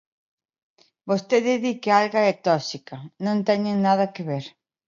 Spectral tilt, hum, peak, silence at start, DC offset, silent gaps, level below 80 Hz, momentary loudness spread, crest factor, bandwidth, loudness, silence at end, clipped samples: -6 dB/octave; none; -4 dBFS; 1.05 s; under 0.1%; none; -74 dBFS; 13 LU; 20 dB; 7.4 kHz; -22 LUFS; 0.4 s; under 0.1%